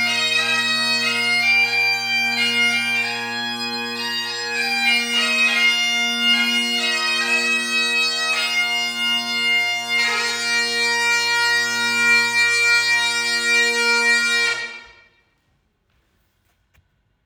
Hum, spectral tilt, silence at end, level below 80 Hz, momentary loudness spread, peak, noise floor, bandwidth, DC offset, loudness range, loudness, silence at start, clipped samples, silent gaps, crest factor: none; 0 dB/octave; 2.4 s; -70 dBFS; 7 LU; -6 dBFS; -66 dBFS; over 20 kHz; under 0.1%; 3 LU; -17 LUFS; 0 s; under 0.1%; none; 14 dB